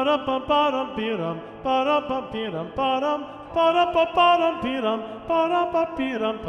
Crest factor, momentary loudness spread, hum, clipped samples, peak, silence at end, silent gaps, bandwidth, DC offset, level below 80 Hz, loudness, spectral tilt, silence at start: 18 dB; 11 LU; none; under 0.1%; -6 dBFS; 0 s; none; 8.8 kHz; under 0.1%; -54 dBFS; -23 LUFS; -6 dB/octave; 0 s